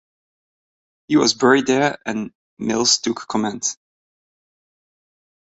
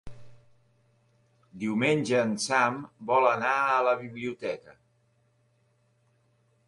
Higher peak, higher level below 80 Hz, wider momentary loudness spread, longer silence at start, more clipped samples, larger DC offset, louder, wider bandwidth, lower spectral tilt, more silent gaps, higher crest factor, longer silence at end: first, -2 dBFS vs -8 dBFS; about the same, -62 dBFS vs -66 dBFS; about the same, 13 LU vs 12 LU; first, 1.1 s vs 0.05 s; neither; neither; first, -19 LUFS vs -27 LUFS; second, 8.2 kHz vs 11.5 kHz; second, -3 dB/octave vs -4.5 dB/octave; first, 2.35-2.57 s vs none; about the same, 20 dB vs 20 dB; about the same, 1.85 s vs 1.95 s